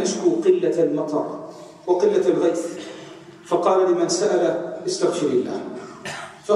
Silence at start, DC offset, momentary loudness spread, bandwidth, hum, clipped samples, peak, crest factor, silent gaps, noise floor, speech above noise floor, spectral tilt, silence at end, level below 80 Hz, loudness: 0 s; under 0.1%; 16 LU; 11.5 kHz; none; under 0.1%; -4 dBFS; 16 dB; none; -41 dBFS; 21 dB; -4.5 dB/octave; 0 s; -70 dBFS; -21 LUFS